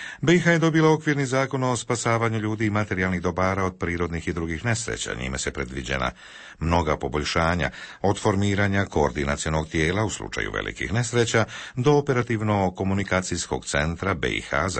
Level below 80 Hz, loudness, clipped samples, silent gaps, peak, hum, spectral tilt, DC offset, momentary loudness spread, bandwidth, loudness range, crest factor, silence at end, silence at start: -40 dBFS; -24 LUFS; under 0.1%; none; -8 dBFS; none; -5 dB/octave; under 0.1%; 8 LU; 8.8 kHz; 4 LU; 16 dB; 0 s; 0 s